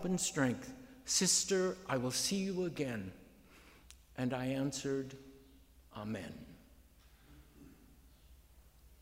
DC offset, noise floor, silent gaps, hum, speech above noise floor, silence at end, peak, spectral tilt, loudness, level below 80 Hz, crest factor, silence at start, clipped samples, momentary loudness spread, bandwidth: under 0.1%; -63 dBFS; none; none; 27 dB; 0.05 s; -18 dBFS; -3.5 dB/octave; -36 LUFS; -64 dBFS; 22 dB; 0 s; under 0.1%; 21 LU; 16 kHz